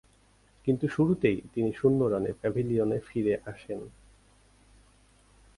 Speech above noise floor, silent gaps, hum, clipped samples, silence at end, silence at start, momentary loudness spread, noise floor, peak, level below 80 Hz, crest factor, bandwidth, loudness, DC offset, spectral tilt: 35 dB; none; none; under 0.1%; 1.7 s; 0.65 s; 14 LU; -62 dBFS; -12 dBFS; -58 dBFS; 18 dB; 11.5 kHz; -29 LUFS; under 0.1%; -8.5 dB/octave